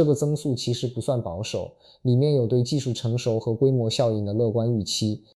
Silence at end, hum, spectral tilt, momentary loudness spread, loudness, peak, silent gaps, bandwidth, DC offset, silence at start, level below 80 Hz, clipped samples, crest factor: 0.2 s; none; -6.5 dB/octave; 8 LU; -24 LUFS; -10 dBFS; none; 12.5 kHz; under 0.1%; 0 s; -58 dBFS; under 0.1%; 14 dB